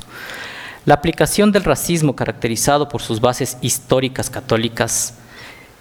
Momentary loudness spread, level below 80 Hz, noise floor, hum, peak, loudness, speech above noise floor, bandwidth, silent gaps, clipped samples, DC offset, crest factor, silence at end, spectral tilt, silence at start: 15 LU; -40 dBFS; -39 dBFS; none; 0 dBFS; -17 LUFS; 22 dB; over 20 kHz; none; under 0.1%; under 0.1%; 18 dB; 0.2 s; -4 dB/octave; 0.1 s